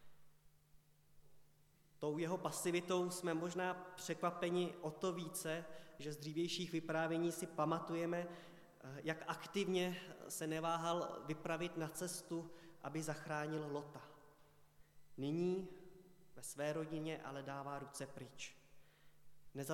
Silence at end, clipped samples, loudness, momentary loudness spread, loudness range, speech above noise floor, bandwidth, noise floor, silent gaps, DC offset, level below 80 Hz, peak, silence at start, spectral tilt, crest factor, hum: 0 s; under 0.1%; -43 LUFS; 14 LU; 6 LU; 27 dB; 16.5 kHz; -70 dBFS; none; under 0.1%; -78 dBFS; -24 dBFS; 0 s; -4.5 dB/octave; 20 dB; none